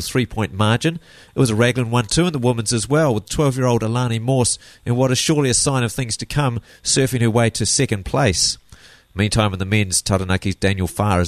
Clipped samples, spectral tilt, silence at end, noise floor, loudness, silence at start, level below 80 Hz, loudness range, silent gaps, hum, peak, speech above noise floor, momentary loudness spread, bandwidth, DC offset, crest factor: under 0.1%; -4.5 dB/octave; 0 s; -46 dBFS; -18 LUFS; 0 s; -40 dBFS; 1 LU; none; none; -2 dBFS; 28 dB; 7 LU; 13.5 kHz; under 0.1%; 16 dB